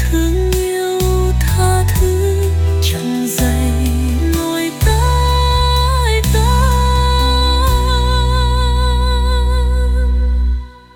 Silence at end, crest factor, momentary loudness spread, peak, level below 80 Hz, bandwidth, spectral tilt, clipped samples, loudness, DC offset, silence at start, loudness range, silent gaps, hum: 0.25 s; 10 dB; 3 LU; -2 dBFS; -16 dBFS; 18 kHz; -5 dB/octave; under 0.1%; -15 LUFS; under 0.1%; 0 s; 2 LU; none; none